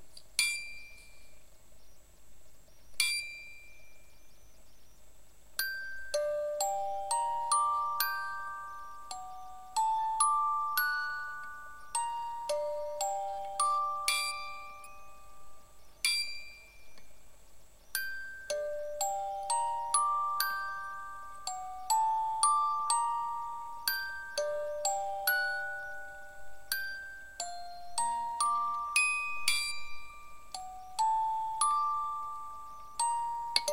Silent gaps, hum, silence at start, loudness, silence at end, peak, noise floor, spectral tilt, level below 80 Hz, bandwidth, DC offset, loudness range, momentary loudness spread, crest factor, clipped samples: none; none; 0 s; -33 LUFS; 0 s; -8 dBFS; -59 dBFS; 1.5 dB/octave; -64 dBFS; 16 kHz; 0.4%; 7 LU; 17 LU; 26 dB; under 0.1%